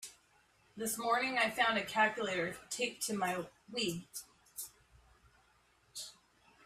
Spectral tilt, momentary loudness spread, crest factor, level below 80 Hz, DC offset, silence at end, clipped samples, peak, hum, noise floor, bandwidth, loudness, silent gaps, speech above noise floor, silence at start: -2.5 dB/octave; 18 LU; 22 dB; -72 dBFS; under 0.1%; 0.55 s; under 0.1%; -16 dBFS; none; -70 dBFS; 16 kHz; -35 LUFS; none; 35 dB; 0 s